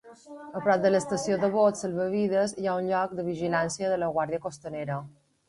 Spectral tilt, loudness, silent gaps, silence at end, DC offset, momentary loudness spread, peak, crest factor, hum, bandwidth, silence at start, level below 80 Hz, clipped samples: -5.5 dB/octave; -27 LUFS; none; 0.4 s; under 0.1%; 12 LU; -10 dBFS; 18 dB; none; 11.5 kHz; 0.05 s; -64 dBFS; under 0.1%